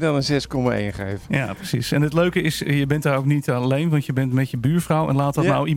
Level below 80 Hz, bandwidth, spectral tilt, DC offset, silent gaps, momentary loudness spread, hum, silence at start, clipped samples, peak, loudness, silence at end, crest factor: -46 dBFS; 16.5 kHz; -6.5 dB/octave; under 0.1%; none; 5 LU; none; 0 s; under 0.1%; -6 dBFS; -21 LUFS; 0 s; 14 dB